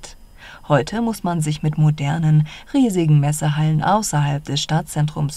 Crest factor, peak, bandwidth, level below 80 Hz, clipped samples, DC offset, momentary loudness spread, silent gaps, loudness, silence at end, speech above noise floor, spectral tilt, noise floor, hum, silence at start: 16 dB; -4 dBFS; 13 kHz; -44 dBFS; under 0.1%; under 0.1%; 6 LU; none; -19 LUFS; 0 s; 23 dB; -6 dB/octave; -41 dBFS; none; 0 s